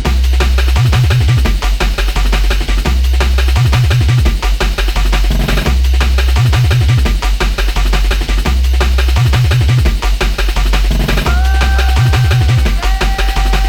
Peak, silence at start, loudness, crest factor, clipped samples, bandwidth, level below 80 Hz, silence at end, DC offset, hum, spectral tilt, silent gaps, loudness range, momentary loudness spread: 0 dBFS; 0 s; -13 LUFS; 10 dB; under 0.1%; 17.5 kHz; -12 dBFS; 0 s; under 0.1%; none; -5 dB/octave; none; 1 LU; 4 LU